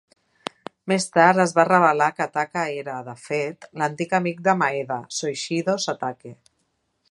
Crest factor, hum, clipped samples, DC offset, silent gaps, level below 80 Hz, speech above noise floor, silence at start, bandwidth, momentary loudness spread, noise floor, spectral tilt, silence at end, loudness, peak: 22 dB; none; under 0.1%; under 0.1%; none; -72 dBFS; 50 dB; 0.85 s; 11.5 kHz; 17 LU; -72 dBFS; -4.5 dB/octave; 0.75 s; -22 LUFS; 0 dBFS